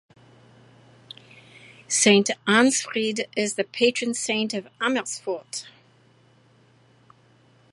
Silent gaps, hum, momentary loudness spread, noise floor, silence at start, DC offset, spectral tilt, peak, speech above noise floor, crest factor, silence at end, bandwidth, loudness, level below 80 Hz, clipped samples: none; none; 17 LU; -58 dBFS; 1.9 s; under 0.1%; -2.5 dB/octave; -4 dBFS; 35 dB; 22 dB; 2.05 s; 11.5 kHz; -23 LUFS; -74 dBFS; under 0.1%